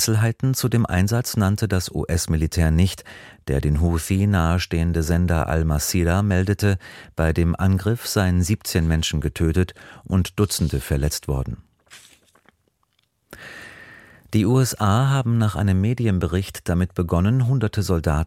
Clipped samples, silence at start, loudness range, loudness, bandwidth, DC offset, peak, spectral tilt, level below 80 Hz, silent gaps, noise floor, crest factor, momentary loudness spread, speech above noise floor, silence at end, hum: under 0.1%; 0 s; 6 LU; -21 LUFS; 16.5 kHz; under 0.1%; -4 dBFS; -6 dB/octave; -32 dBFS; none; -68 dBFS; 16 dB; 7 LU; 48 dB; 0 s; none